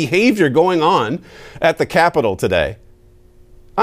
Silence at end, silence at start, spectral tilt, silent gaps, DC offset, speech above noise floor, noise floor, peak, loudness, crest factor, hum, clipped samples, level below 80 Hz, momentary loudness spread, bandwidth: 0 s; 0 s; -5.5 dB/octave; none; under 0.1%; 31 dB; -46 dBFS; -2 dBFS; -16 LUFS; 14 dB; none; under 0.1%; -44 dBFS; 10 LU; 16 kHz